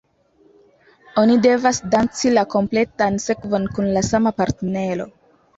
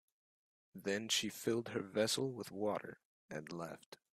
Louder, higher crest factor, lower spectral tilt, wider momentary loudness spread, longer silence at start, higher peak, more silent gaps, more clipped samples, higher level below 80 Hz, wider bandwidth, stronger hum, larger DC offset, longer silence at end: first, -19 LUFS vs -40 LUFS; second, 16 dB vs 22 dB; first, -5 dB/octave vs -3.5 dB/octave; second, 9 LU vs 14 LU; first, 1.15 s vs 0.75 s; first, -4 dBFS vs -20 dBFS; second, none vs 3.05-3.29 s, 3.86-3.92 s; neither; first, -48 dBFS vs -80 dBFS; second, 8 kHz vs 15.5 kHz; neither; neither; first, 0.5 s vs 0.2 s